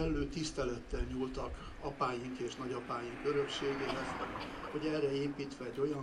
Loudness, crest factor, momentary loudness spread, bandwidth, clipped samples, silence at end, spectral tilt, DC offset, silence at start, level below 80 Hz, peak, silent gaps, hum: -39 LUFS; 16 dB; 7 LU; 12 kHz; under 0.1%; 0 s; -5.5 dB/octave; under 0.1%; 0 s; -50 dBFS; -22 dBFS; none; none